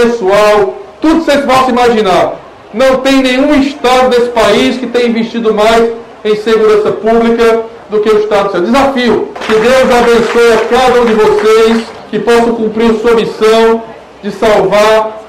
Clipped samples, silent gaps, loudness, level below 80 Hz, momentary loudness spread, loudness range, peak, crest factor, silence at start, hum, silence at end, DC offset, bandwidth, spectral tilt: under 0.1%; none; -8 LUFS; -36 dBFS; 8 LU; 2 LU; 0 dBFS; 8 dB; 0 s; none; 0 s; 0.2%; 15.5 kHz; -4.5 dB/octave